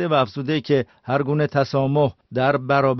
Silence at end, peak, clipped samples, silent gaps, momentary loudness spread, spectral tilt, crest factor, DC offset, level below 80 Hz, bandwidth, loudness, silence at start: 0 s; -4 dBFS; under 0.1%; none; 4 LU; -5.5 dB/octave; 16 dB; under 0.1%; -56 dBFS; 6.2 kHz; -21 LUFS; 0 s